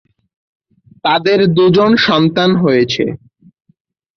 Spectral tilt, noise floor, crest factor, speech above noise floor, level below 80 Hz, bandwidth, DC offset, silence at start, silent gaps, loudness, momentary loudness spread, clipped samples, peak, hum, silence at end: -6.5 dB/octave; -58 dBFS; 12 dB; 47 dB; -52 dBFS; 6.6 kHz; under 0.1%; 1.05 s; none; -12 LUFS; 9 LU; under 0.1%; -2 dBFS; none; 1 s